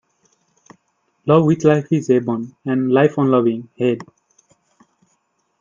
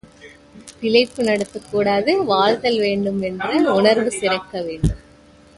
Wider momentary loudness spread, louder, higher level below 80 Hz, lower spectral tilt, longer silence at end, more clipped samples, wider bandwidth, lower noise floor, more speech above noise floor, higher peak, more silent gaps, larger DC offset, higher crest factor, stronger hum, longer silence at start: about the same, 10 LU vs 8 LU; about the same, -17 LUFS vs -19 LUFS; second, -60 dBFS vs -38 dBFS; first, -8 dB/octave vs -5 dB/octave; first, 1.6 s vs 0.6 s; neither; second, 7.6 kHz vs 11.5 kHz; first, -67 dBFS vs -48 dBFS; first, 50 dB vs 30 dB; about the same, 0 dBFS vs 0 dBFS; neither; neither; about the same, 18 dB vs 18 dB; neither; first, 1.25 s vs 0.25 s